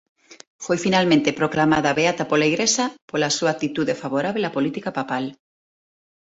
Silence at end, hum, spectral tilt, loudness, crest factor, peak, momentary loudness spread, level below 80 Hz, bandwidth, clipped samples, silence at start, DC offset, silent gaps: 0.85 s; none; -4 dB/octave; -21 LUFS; 18 dB; -4 dBFS; 8 LU; -58 dBFS; 8 kHz; under 0.1%; 0.3 s; under 0.1%; 0.47-0.59 s, 3.02-3.08 s